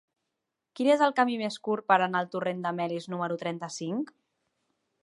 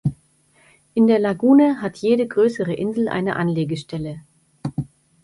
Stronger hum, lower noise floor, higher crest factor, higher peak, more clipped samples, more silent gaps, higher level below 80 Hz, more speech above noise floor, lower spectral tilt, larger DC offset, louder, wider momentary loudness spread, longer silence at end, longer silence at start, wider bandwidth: neither; first, -85 dBFS vs -58 dBFS; first, 22 dB vs 16 dB; about the same, -6 dBFS vs -6 dBFS; neither; neither; second, -84 dBFS vs -54 dBFS; first, 57 dB vs 39 dB; second, -5 dB/octave vs -8 dB/octave; neither; second, -28 LUFS vs -20 LUFS; second, 11 LU vs 16 LU; first, 1 s vs 0.4 s; first, 0.75 s vs 0.05 s; about the same, 11.5 kHz vs 11.5 kHz